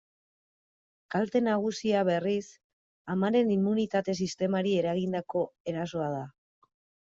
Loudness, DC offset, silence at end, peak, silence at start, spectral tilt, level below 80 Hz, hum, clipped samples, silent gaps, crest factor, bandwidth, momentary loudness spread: -29 LUFS; under 0.1%; 0.8 s; -14 dBFS; 1.1 s; -6.5 dB/octave; -70 dBFS; none; under 0.1%; 2.64-3.05 s, 5.60-5.65 s; 16 dB; 7.8 kHz; 8 LU